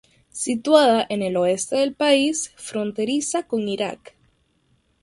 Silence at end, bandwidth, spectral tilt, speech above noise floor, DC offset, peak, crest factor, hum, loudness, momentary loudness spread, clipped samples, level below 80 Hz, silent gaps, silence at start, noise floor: 1.05 s; 11.5 kHz; -3.5 dB/octave; 44 dB; under 0.1%; -2 dBFS; 20 dB; none; -21 LUFS; 13 LU; under 0.1%; -64 dBFS; none; 0.35 s; -65 dBFS